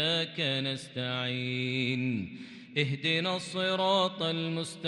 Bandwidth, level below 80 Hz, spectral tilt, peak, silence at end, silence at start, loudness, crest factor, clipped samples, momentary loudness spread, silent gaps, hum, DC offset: 12 kHz; -72 dBFS; -5 dB/octave; -14 dBFS; 0 s; 0 s; -30 LUFS; 18 dB; under 0.1%; 8 LU; none; none; under 0.1%